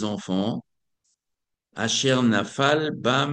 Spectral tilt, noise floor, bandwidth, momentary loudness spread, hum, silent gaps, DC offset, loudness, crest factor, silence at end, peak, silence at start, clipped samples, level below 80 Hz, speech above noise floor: -4 dB/octave; -83 dBFS; 10 kHz; 9 LU; none; none; under 0.1%; -23 LUFS; 20 dB; 0 s; -6 dBFS; 0 s; under 0.1%; -68 dBFS; 61 dB